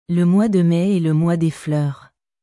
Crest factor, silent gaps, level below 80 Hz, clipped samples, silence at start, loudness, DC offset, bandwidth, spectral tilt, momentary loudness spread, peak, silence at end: 10 dB; none; -56 dBFS; under 0.1%; 0.1 s; -18 LUFS; under 0.1%; 11.5 kHz; -8.5 dB/octave; 7 LU; -8 dBFS; 0.45 s